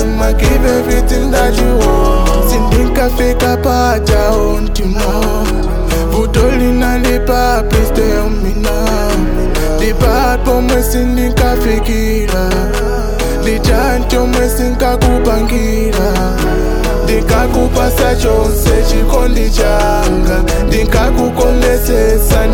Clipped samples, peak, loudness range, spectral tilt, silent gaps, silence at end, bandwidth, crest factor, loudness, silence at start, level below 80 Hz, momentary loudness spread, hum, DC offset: under 0.1%; 0 dBFS; 2 LU; -5.5 dB/octave; none; 0 s; 18.5 kHz; 10 dB; -12 LUFS; 0 s; -14 dBFS; 4 LU; none; under 0.1%